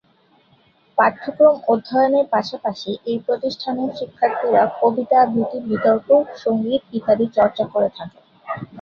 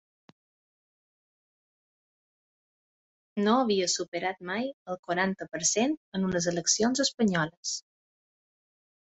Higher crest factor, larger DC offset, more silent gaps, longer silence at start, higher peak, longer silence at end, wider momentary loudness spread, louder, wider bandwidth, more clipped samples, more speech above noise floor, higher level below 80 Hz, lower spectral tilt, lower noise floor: about the same, 16 dB vs 20 dB; neither; second, none vs 4.08-4.12 s, 4.74-4.86 s, 4.99-5.03 s, 5.97-6.12 s, 7.14-7.18 s, 7.57-7.63 s; second, 0.95 s vs 3.35 s; first, -2 dBFS vs -12 dBFS; second, 0 s vs 1.2 s; about the same, 10 LU vs 10 LU; first, -19 LUFS vs -28 LUFS; second, 6.8 kHz vs 8.4 kHz; neither; second, 39 dB vs over 62 dB; first, -60 dBFS vs -68 dBFS; first, -7 dB/octave vs -3 dB/octave; second, -57 dBFS vs under -90 dBFS